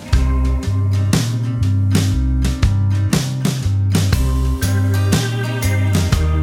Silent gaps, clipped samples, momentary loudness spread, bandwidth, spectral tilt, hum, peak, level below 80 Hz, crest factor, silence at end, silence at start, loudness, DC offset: none; under 0.1%; 3 LU; 18.5 kHz; -6 dB/octave; none; 0 dBFS; -22 dBFS; 14 dB; 0 s; 0 s; -17 LUFS; under 0.1%